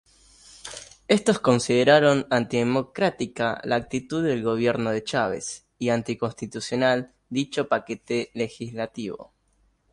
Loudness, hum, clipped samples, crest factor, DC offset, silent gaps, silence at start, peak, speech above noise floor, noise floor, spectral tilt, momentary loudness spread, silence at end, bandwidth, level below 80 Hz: -24 LUFS; none; under 0.1%; 20 dB; under 0.1%; none; 0.65 s; -4 dBFS; 42 dB; -66 dBFS; -5 dB/octave; 13 LU; 0.7 s; 11.5 kHz; -60 dBFS